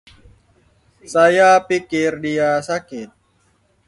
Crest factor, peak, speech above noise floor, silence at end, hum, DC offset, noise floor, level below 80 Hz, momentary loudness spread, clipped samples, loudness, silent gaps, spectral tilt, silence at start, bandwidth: 18 dB; -2 dBFS; 44 dB; 0.8 s; none; under 0.1%; -60 dBFS; -58 dBFS; 13 LU; under 0.1%; -16 LUFS; none; -4.5 dB/octave; 1.1 s; 11.5 kHz